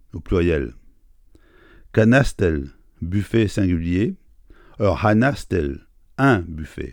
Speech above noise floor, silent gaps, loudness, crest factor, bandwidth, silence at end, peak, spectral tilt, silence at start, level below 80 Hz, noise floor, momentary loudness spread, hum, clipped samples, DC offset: 32 dB; none; -20 LUFS; 20 dB; 17 kHz; 0 s; 0 dBFS; -7.5 dB/octave; 0.15 s; -36 dBFS; -51 dBFS; 16 LU; none; under 0.1%; under 0.1%